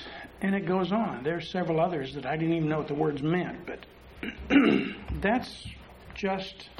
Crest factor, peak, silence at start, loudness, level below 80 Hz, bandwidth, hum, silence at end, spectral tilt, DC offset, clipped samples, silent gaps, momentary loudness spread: 20 dB; -10 dBFS; 0 s; -28 LUFS; -50 dBFS; 12 kHz; none; 0 s; -7 dB/octave; under 0.1%; under 0.1%; none; 16 LU